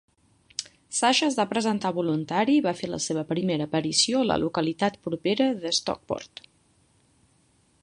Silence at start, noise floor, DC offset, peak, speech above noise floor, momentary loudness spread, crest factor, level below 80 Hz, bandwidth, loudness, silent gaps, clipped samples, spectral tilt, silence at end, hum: 0.6 s; -64 dBFS; under 0.1%; -6 dBFS; 39 dB; 12 LU; 20 dB; -60 dBFS; 11.5 kHz; -25 LUFS; none; under 0.1%; -3.5 dB/octave; 1.55 s; none